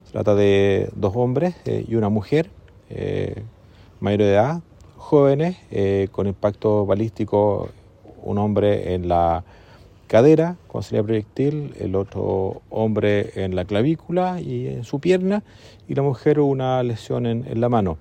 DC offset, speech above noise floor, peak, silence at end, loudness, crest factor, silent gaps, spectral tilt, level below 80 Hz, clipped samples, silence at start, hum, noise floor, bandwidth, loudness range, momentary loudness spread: under 0.1%; 27 dB; -2 dBFS; 0.05 s; -21 LUFS; 18 dB; none; -8 dB/octave; -50 dBFS; under 0.1%; 0.15 s; none; -47 dBFS; 9.4 kHz; 3 LU; 11 LU